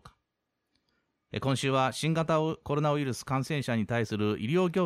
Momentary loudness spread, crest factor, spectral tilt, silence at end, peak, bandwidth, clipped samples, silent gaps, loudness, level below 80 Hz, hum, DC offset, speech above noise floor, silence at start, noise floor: 4 LU; 14 dB; -6 dB/octave; 0 s; -14 dBFS; 14.5 kHz; under 0.1%; none; -29 LUFS; -62 dBFS; none; under 0.1%; 54 dB; 0.05 s; -83 dBFS